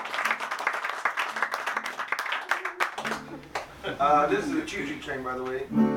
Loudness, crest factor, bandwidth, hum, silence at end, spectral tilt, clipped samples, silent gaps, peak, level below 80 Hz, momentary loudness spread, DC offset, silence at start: -28 LUFS; 22 dB; 19 kHz; none; 0 s; -4 dB/octave; under 0.1%; none; -6 dBFS; -58 dBFS; 11 LU; under 0.1%; 0 s